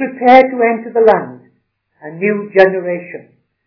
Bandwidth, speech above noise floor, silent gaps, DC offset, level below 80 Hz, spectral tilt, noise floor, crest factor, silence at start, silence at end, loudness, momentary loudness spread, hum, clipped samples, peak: 5.4 kHz; 50 dB; none; under 0.1%; -56 dBFS; -7.5 dB/octave; -62 dBFS; 14 dB; 0 s; 0.45 s; -12 LUFS; 23 LU; none; 1%; 0 dBFS